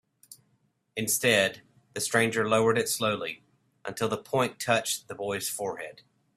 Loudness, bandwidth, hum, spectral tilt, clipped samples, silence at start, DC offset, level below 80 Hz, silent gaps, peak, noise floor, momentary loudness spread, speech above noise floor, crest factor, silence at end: -27 LUFS; 16 kHz; none; -3 dB/octave; under 0.1%; 0.3 s; under 0.1%; -68 dBFS; none; -8 dBFS; -71 dBFS; 16 LU; 44 dB; 22 dB; 0.45 s